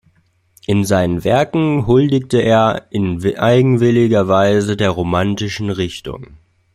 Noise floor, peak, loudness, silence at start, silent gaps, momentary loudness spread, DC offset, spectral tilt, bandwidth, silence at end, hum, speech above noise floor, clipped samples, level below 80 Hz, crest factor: -57 dBFS; -2 dBFS; -15 LUFS; 0.7 s; none; 9 LU; under 0.1%; -6.5 dB/octave; 15.5 kHz; 0.4 s; none; 43 dB; under 0.1%; -44 dBFS; 14 dB